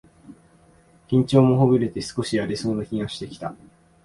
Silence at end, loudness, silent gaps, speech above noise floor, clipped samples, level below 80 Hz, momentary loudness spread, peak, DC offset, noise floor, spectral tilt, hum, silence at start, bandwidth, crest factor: 0.5 s; -22 LUFS; none; 34 dB; under 0.1%; -54 dBFS; 16 LU; -4 dBFS; under 0.1%; -55 dBFS; -7 dB/octave; none; 0.3 s; 11.5 kHz; 18 dB